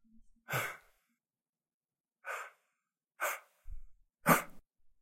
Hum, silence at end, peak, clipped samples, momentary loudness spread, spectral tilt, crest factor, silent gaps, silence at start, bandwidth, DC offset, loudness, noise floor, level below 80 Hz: none; 0.15 s; -12 dBFS; under 0.1%; 25 LU; -4 dB/octave; 28 dB; 1.49-1.53 s, 1.74-1.81 s; 0.5 s; 16.5 kHz; under 0.1%; -35 LUFS; under -90 dBFS; -60 dBFS